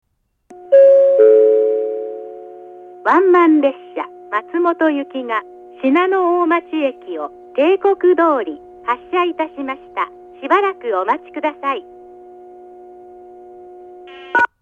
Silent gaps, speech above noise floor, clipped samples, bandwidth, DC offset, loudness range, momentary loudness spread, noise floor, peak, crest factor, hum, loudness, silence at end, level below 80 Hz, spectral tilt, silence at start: none; 32 dB; under 0.1%; 4.6 kHz; under 0.1%; 8 LU; 18 LU; -49 dBFS; 0 dBFS; 16 dB; none; -15 LUFS; 0.15 s; -66 dBFS; -5.5 dB/octave; 0.5 s